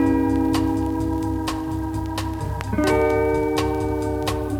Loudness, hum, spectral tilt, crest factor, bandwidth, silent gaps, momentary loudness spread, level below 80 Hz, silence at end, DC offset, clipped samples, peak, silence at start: -22 LUFS; none; -6.5 dB/octave; 14 dB; 17.5 kHz; none; 7 LU; -32 dBFS; 0 s; under 0.1%; under 0.1%; -6 dBFS; 0 s